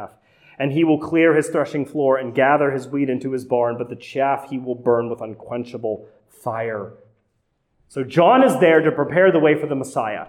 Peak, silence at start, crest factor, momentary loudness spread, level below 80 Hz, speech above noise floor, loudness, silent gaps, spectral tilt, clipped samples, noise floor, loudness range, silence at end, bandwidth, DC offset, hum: -4 dBFS; 0 s; 16 dB; 15 LU; -64 dBFS; 50 dB; -19 LUFS; none; -6.5 dB/octave; under 0.1%; -69 dBFS; 9 LU; 0 s; 14 kHz; under 0.1%; none